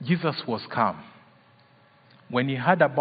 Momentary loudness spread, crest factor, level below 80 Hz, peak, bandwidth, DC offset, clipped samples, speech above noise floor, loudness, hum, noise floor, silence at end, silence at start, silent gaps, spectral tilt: 9 LU; 20 dB; -72 dBFS; -6 dBFS; 5 kHz; under 0.1%; under 0.1%; 34 dB; -25 LUFS; none; -58 dBFS; 0 s; 0 s; none; -10.5 dB/octave